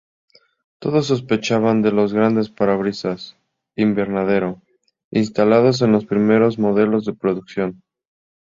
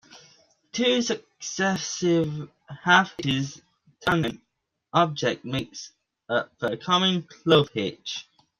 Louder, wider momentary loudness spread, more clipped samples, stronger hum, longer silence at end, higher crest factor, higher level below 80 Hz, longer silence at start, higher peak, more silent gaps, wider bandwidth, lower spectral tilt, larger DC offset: first, -18 LUFS vs -25 LUFS; second, 11 LU vs 15 LU; neither; neither; first, 0.7 s vs 0.35 s; second, 16 dB vs 22 dB; about the same, -56 dBFS vs -60 dBFS; first, 0.8 s vs 0.15 s; about the same, -2 dBFS vs -4 dBFS; first, 5.04-5.11 s vs none; second, 7.6 kHz vs 14 kHz; first, -7 dB/octave vs -4.5 dB/octave; neither